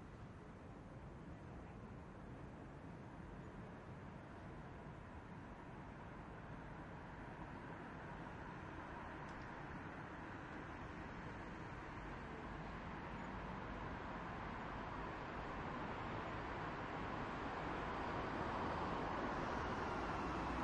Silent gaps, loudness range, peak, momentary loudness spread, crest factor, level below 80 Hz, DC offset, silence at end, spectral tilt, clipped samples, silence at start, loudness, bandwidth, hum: none; 10 LU; -30 dBFS; 11 LU; 18 dB; -60 dBFS; under 0.1%; 0 s; -6.5 dB/octave; under 0.1%; 0 s; -49 LUFS; 10.5 kHz; none